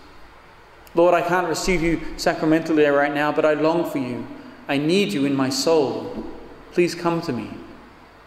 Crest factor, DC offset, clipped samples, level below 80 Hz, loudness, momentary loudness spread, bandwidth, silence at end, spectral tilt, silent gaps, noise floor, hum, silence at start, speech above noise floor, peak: 16 dB; under 0.1%; under 0.1%; -42 dBFS; -21 LUFS; 15 LU; 15.5 kHz; 0.4 s; -5 dB/octave; none; -47 dBFS; none; 0 s; 26 dB; -6 dBFS